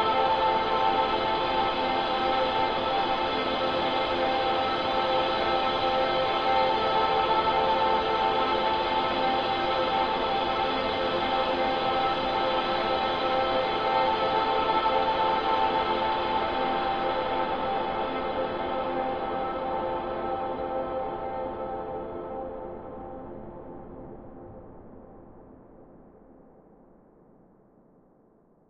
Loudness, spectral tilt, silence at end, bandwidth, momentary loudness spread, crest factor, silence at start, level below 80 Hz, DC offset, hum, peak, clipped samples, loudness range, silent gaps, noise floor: -26 LUFS; -5.5 dB/octave; 2.35 s; 7.8 kHz; 12 LU; 16 dB; 0 s; -50 dBFS; under 0.1%; none; -12 dBFS; under 0.1%; 12 LU; none; -61 dBFS